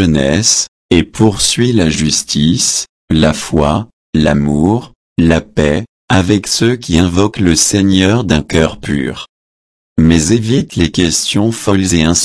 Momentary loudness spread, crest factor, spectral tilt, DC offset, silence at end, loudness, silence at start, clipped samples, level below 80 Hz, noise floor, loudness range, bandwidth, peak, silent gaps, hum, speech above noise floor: 7 LU; 12 dB; -4.5 dB/octave; under 0.1%; 0 s; -12 LUFS; 0 s; under 0.1%; -30 dBFS; under -90 dBFS; 2 LU; 11 kHz; 0 dBFS; 0.68-0.89 s, 2.89-3.08 s, 3.93-4.13 s, 4.95-5.16 s, 5.89-6.08 s, 9.29-9.96 s; none; over 79 dB